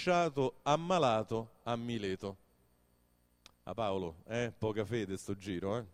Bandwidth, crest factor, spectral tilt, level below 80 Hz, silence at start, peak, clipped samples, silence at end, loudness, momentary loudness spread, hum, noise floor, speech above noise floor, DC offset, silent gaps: 15.5 kHz; 20 dB; -5.5 dB/octave; -66 dBFS; 0 s; -16 dBFS; under 0.1%; 0.05 s; -36 LUFS; 10 LU; 60 Hz at -65 dBFS; -72 dBFS; 37 dB; under 0.1%; none